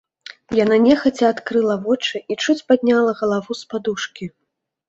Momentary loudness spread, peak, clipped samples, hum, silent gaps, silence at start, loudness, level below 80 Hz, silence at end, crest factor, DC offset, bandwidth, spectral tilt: 13 LU; -2 dBFS; under 0.1%; none; none; 0.5 s; -18 LUFS; -58 dBFS; 0.6 s; 16 dB; under 0.1%; 8 kHz; -5 dB/octave